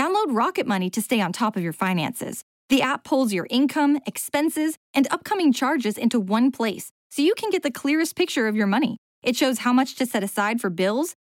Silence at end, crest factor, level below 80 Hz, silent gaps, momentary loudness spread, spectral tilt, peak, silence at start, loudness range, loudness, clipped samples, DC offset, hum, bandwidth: 0.2 s; 12 dB; -70 dBFS; 2.43-2.69 s, 4.77-4.94 s, 6.91-7.10 s, 8.98-9.22 s; 6 LU; -4.5 dB/octave; -10 dBFS; 0 s; 1 LU; -23 LUFS; under 0.1%; under 0.1%; none; 17 kHz